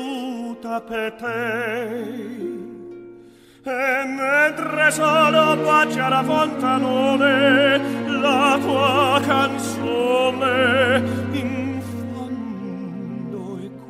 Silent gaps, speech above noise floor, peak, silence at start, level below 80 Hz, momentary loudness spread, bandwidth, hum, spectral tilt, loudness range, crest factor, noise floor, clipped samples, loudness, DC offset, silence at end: none; 28 dB; -4 dBFS; 0 s; -62 dBFS; 15 LU; 15.5 kHz; none; -4.5 dB/octave; 9 LU; 16 dB; -46 dBFS; under 0.1%; -19 LUFS; under 0.1%; 0 s